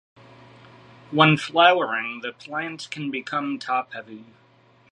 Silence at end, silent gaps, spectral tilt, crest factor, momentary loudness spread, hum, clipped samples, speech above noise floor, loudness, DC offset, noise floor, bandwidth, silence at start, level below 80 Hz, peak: 0.7 s; none; -5.5 dB/octave; 24 dB; 16 LU; none; under 0.1%; 25 dB; -22 LUFS; under 0.1%; -48 dBFS; 11 kHz; 1.1 s; -72 dBFS; -2 dBFS